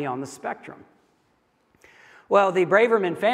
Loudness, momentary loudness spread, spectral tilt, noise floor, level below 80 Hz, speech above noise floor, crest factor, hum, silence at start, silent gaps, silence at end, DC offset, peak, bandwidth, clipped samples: -21 LUFS; 17 LU; -5.5 dB/octave; -66 dBFS; -76 dBFS; 44 dB; 20 dB; none; 0 s; none; 0 s; under 0.1%; -4 dBFS; 13.5 kHz; under 0.1%